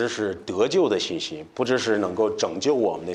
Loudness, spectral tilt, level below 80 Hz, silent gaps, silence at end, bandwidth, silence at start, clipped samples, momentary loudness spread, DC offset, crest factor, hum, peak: -24 LUFS; -4 dB/octave; -62 dBFS; none; 0 s; 10.5 kHz; 0 s; under 0.1%; 7 LU; under 0.1%; 16 dB; none; -8 dBFS